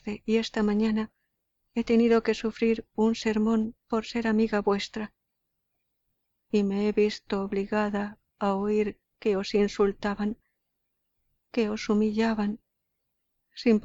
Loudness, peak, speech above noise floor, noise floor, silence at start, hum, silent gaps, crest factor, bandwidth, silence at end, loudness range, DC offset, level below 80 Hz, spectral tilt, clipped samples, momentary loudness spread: -27 LUFS; -12 dBFS; 54 dB; -80 dBFS; 0.05 s; none; none; 16 dB; 7.8 kHz; 0.05 s; 4 LU; under 0.1%; -56 dBFS; -6 dB/octave; under 0.1%; 9 LU